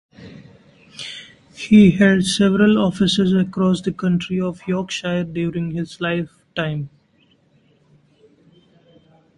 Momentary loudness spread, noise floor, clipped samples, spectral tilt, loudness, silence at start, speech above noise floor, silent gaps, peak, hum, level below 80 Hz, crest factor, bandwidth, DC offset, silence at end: 19 LU; -58 dBFS; under 0.1%; -6 dB/octave; -18 LUFS; 0.2 s; 41 dB; none; -2 dBFS; none; -52 dBFS; 18 dB; 11.5 kHz; under 0.1%; 2.5 s